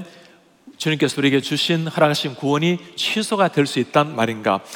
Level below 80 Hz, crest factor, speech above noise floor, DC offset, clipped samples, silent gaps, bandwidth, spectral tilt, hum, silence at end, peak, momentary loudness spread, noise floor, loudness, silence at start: -68 dBFS; 18 dB; 30 dB; under 0.1%; under 0.1%; none; 18 kHz; -5 dB/octave; none; 0 s; -2 dBFS; 4 LU; -50 dBFS; -19 LUFS; 0 s